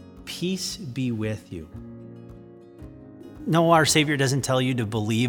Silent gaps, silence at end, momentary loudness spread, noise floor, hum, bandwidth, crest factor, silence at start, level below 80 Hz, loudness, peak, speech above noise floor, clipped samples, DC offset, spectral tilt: none; 0 s; 26 LU; -45 dBFS; none; 19 kHz; 20 dB; 0 s; -54 dBFS; -23 LUFS; -4 dBFS; 22 dB; under 0.1%; under 0.1%; -4.5 dB/octave